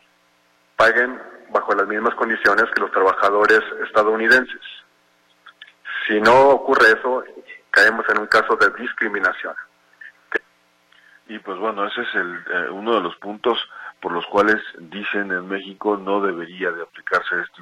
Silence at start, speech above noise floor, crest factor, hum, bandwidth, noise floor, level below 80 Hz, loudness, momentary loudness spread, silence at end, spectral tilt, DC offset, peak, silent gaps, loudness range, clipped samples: 0.8 s; 41 dB; 18 dB; none; 15.5 kHz; -60 dBFS; -58 dBFS; -18 LUFS; 16 LU; 0.15 s; -4 dB/octave; under 0.1%; -2 dBFS; none; 9 LU; under 0.1%